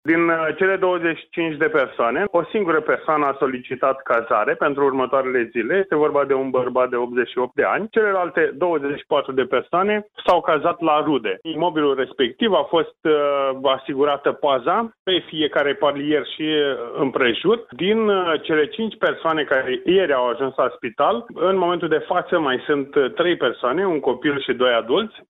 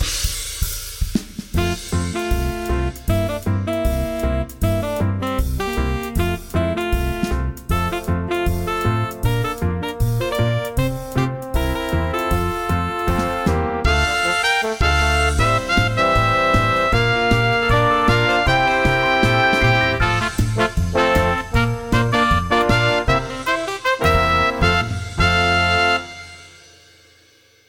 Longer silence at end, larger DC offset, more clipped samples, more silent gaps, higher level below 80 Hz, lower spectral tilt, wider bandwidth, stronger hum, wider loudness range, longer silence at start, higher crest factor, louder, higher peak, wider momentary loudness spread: second, 0.1 s vs 1.2 s; second, under 0.1% vs 0.1%; neither; first, 14.99-15.06 s vs none; second, -62 dBFS vs -26 dBFS; first, -7.5 dB/octave vs -5 dB/octave; second, 4.9 kHz vs 17 kHz; neither; second, 1 LU vs 6 LU; about the same, 0.05 s vs 0 s; about the same, 14 dB vs 16 dB; about the same, -20 LUFS vs -19 LUFS; second, -6 dBFS vs -2 dBFS; second, 4 LU vs 7 LU